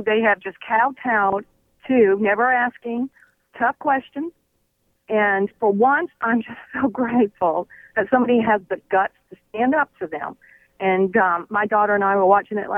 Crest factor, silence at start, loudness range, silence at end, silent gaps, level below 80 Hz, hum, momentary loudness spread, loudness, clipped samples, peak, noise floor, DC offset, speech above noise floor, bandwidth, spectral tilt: 18 dB; 0 s; 2 LU; 0 s; none; -62 dBFS; none; 11 LU; -20 LUFS; under 0.1%; -2 dBFS; -68 dBFS; under 0.1%; 48 dB; 3.7 kHz; -8.5 dB/octave